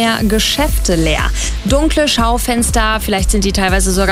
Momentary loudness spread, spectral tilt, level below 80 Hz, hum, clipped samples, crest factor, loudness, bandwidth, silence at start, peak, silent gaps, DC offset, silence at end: 3 LU; -3.5 dB/octave; -18 dBFS; none; under 0.1%; 12 dB; -14 LUFS; 16 kHz; 0 s; -2 dBFS; none; under 0.1%; 0 s